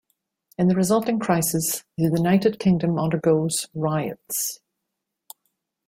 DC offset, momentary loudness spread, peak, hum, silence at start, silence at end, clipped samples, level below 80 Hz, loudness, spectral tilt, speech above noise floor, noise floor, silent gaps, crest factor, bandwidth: under 0.1%; 7 LU; -6 dBFS; none; 0.6 s; 1.3 s; under 0.1%; -58 dBFS; -22 LUFS; -5.5 dB/octave; 60 dB; -81 dBFS; none; 18 dB; 16.5 kHz